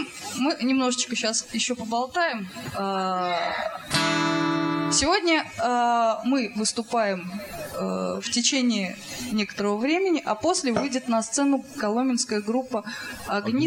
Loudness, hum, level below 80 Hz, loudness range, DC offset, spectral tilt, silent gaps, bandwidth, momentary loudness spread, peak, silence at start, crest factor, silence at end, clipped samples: -25 LUFS; none; -58 dBFS; 3 LU; under 0.1%; -3 dB/octave; none; 17 kHz; 9 LU; -6 dBFS; 0 s; 18 dB; 0 s; under 0.1%